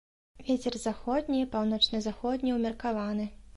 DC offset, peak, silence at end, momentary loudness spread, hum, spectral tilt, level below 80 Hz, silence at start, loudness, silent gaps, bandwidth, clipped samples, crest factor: under 0.1%; -12 dBFS; 0.05 s; 8 LU; none; -4.5 dB/octave; -52 dBFS; 0.35 s; -30 LUFS; none; 11.5 kHz; under 0.1%; 18 dB